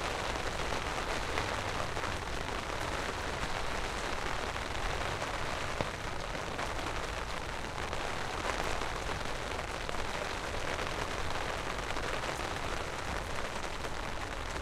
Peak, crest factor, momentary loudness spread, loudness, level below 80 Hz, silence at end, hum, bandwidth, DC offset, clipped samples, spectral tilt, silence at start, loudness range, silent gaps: -12 dBFS; 24 dB; 3 LU; -36 LUFS; -44 dBFS; 0 s; none; 15.5 kHz; under 0.1%; under 0.1%; -3.5 dB/octave; 0 s; 1 LU; none